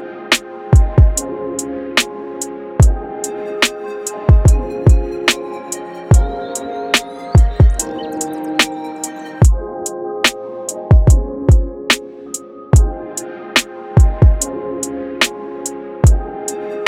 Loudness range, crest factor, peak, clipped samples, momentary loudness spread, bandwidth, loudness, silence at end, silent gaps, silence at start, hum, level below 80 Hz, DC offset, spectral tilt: 2 LU; 14 dB; 0 dBFS; under 0.1%; 13 LU; 16 kHz; -16 LUFS; 0 s; none; 0 s; none; -18 dBFS; under 0.1%; -4.5 dB/octave